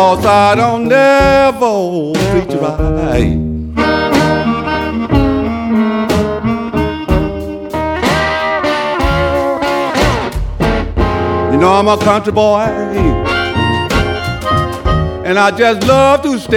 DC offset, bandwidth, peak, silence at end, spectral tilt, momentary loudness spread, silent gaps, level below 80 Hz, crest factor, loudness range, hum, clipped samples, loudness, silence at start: under 0.1%; 17.5 kHz; 0 dBFS; 0 s; -6 dB/octave; 7 LU; none; -24 dBFS; 12 dB; 3 LU; none; under 0.1%; -12 LUFS; 0 s